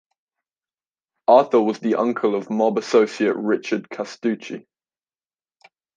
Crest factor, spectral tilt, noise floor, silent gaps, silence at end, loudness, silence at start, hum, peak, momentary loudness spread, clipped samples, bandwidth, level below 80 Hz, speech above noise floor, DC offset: 20 dB; -6 dB/octave; under -90 dBFS; none; 1.4 s; -20 LUFS; 1.3 s; none; -2 dBFS; 12 LU; under 0.1%; 9.4 kHz; -76 dBFS; over 70 dB; under 0.1%